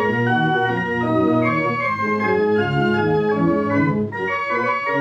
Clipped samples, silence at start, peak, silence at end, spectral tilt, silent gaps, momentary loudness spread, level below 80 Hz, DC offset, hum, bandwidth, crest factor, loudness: under 0.1%; 0 s; -6 dBFS; 0 s; -8 dB/octave; none; 3 LU; -52 dBFS; under 0.1%; none; 8 kHz; 12 dB; -19 LUFS